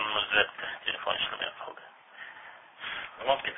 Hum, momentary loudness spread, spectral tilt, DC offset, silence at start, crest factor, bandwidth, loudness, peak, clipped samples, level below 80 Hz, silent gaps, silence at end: none; 22 LU; -5.5 dB/octave; under 0.1%; 0 s; 24 dB; 3.9 kHz; -30 LUFS; -8 dBFS; under 0.1%; -66 dBFS; none; 0 s